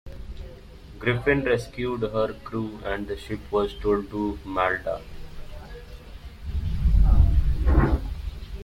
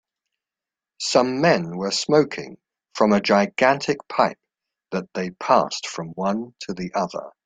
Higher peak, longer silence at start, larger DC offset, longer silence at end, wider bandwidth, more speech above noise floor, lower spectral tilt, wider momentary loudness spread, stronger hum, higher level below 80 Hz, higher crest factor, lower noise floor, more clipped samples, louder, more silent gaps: second, -6 dBFS vs -2 dBFS; second, 0.05 s vs 1 s; neither; second, 0 s vs 0.15 s; about the same, 10 kHz vs 9.4 kHz; second, 17 dB vs 68 dB; first, -7.5 dB/octave vs -4.5 dB/octave; first, 22 LU vs 13 LU; neither; first, -28 dBFS vs -62 dBFS; about the same, 18 dB vs 20 dB; second, -43 dBFS vs -89 dBFS; neither; second, -26 LUFS vs -22 LUFS; neither